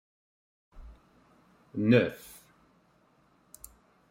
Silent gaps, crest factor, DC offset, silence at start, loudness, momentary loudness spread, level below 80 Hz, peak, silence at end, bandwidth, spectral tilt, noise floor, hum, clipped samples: none; 24 dB; under 0.1%; 0.75 s; -27 LUFS; 27 LU; -60 dBFS; -10 dBFS; 1.95 s; 16 kHz; -7 dB/octave; -66 dBFS; none; under 0.1%